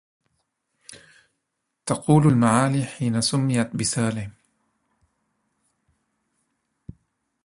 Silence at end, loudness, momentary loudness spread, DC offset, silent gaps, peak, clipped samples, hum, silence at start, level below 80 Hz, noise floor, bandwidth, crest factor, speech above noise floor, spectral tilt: 3.15 s; -21 LUFS; 13 LU; under 0.1%; none; -4 dBFS; under 0.1%; none; 0.9 s; -56 dBFS; -79 dBFS; 11.5 kHz; 22 dB; 58 dB; -5.5 dB/octave